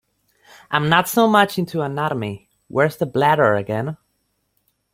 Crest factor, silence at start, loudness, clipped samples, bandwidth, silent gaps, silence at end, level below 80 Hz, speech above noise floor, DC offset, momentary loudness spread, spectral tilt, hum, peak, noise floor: 18 dB; 0.7 s; -19 LUFS; under 0.1%; 16.5 kHz; none; 1 s; -58 dBFS; 51 dB; under 0.1%; 13 LU; -5.5 dB/octave; none; -2 dBFS; -70 dBFS